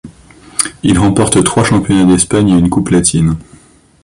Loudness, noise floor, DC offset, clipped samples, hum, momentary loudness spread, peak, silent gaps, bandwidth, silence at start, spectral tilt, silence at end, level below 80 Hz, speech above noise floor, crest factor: -11 LUFS; -43 dBFS; under 0.1%; under 0.1%; none; 7 LU; 0 dBFS; none; 15 kHz; 0.05 s; -5 dB/octave; 0.6 s; -32 dBFS; 33 dB; 12 dB